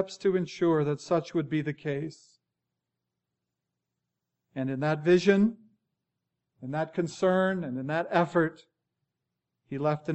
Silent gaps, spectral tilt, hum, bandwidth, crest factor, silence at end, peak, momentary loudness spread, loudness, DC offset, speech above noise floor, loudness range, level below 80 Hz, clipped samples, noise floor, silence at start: none; -7 dB/octave; 60 Hz at -60 dBFS; 8.4 kHz; 22 dB; 0 s; -8 dBFS; 12 LU; -28 LUFS; under 0.1%; 58 dB; 9 LU; -72 dBFS; under 0.1%; -86 dBFS; 0 s